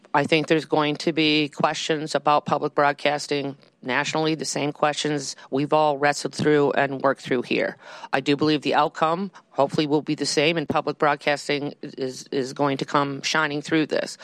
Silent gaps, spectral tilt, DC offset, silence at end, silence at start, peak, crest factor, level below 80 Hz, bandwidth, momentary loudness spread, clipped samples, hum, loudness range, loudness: none; -4.5 dB/octave; under 0.1%; 0 s; 0.15 s; -4 dBFS; 18 dB; -68 dBFS; 13 kHz; 8 LU; under 0.1%; none; 2 LU; -23 LUFS